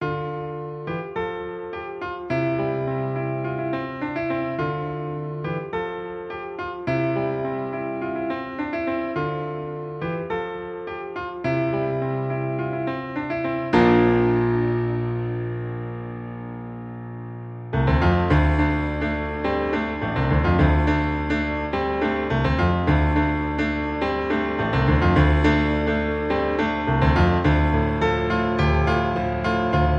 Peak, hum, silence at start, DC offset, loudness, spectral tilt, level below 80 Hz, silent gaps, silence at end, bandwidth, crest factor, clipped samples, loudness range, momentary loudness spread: -6 dBFS; none; 0 s; under 0.1%; -23 LUFS; -8.5 dB/octave; -32 dBFS; none; 0 s; 7.2 kHz; 18 dB; under 0.1%; 7 LU; 13 LU